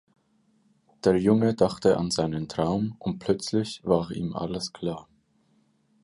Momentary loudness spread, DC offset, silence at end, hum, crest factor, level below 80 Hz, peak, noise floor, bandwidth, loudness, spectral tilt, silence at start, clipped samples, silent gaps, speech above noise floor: 10 LU; under 0.1%; 1 s; none; 20 dB; -54 dBFS; -6 dBFS; -66 dBFS; 11.5 kHz; -26 LUFS; -6 dB/octave; 1.05 s; under 0.1%; none; 41 dB